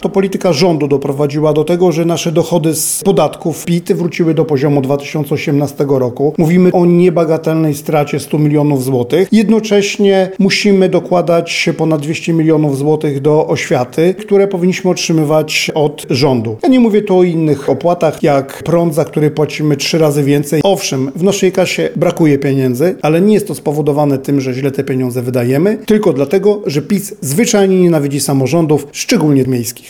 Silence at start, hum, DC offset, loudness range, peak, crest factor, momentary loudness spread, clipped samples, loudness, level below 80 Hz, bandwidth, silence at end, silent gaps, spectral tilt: 0 s; none; 0.2%; 2 LU; 0 dBFS; 10 dB; 5 LU; under 0.1%; -12 LUFS; -50 dBFS; 18.5 kHz; 0 s; none; -6 dB/octave